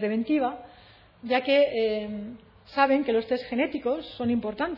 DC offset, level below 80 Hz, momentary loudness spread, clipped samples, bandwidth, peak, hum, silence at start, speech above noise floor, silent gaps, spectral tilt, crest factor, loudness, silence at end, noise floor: under 0.1%; -60 dBFS; 14 LU; under 0.1%; 5.8 kHz; -6 dBFS; none; 0 s; 28 dB; none; -7.5 dB/octave; 20 dB; -26 LUFS; 0 s; -53 dBFS